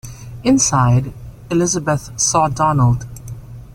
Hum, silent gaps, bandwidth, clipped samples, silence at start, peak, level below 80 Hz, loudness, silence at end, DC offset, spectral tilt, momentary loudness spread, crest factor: none; none; 14.5 kHz; under 0.1%; 0.05 s; -2 dBFS; -38 dBFS; -16 LUFS; 0.05 s; under 0.1%; -5 dB/octave; 20 LU; 16 dB